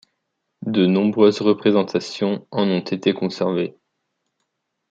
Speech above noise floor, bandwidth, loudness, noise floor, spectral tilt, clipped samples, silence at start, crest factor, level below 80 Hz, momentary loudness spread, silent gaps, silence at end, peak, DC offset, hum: 57 dB; 7.8 kHz; -20 LUFS; -76 dBFS; -7 dB/octave; under 0.1%; 0.6 s; 18 dB; -68 dBFS; 8 LU; none; 1.2 s; -2 dBFS; under 0.1%; none